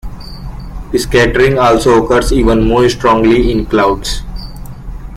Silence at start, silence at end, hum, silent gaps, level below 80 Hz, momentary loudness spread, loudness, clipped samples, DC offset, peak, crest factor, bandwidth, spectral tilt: 0.05 s; 0 s; none; none; -22 dBFS; 20 LU; -11 LUFS; under 0.1%; under 0.1%; 0 dBFS; 12 dB; 15.5 kHz; -5.5 dB/octave